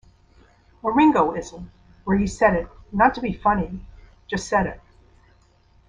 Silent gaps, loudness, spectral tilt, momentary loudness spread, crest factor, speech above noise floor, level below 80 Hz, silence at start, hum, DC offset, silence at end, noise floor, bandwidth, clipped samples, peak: none; -22 LUFS; -6 dB/octave; 16 LU; 20 dB; 36 dB; -42 dBFS; 0.85 s; none; under 0.1%; 1.1 s; -57 dBFS; 10 kHz; under 0.1%; -2 dBFS